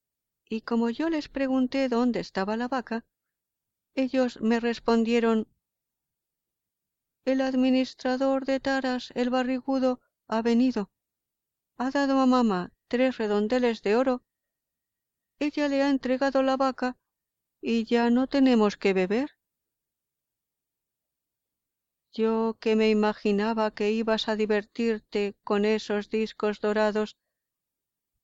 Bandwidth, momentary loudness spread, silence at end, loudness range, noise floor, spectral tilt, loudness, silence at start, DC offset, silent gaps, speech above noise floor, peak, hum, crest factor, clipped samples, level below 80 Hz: 7.8 kHz; 9 LU; 1.1 s; 3 LU; -87 dBFS; -6 dB/octave; -26 LUFS; 0.5 s; under 0.1%; none; 62 dB; -10 dBFS; none; 16 dB; under 0.1%; -62 dBFS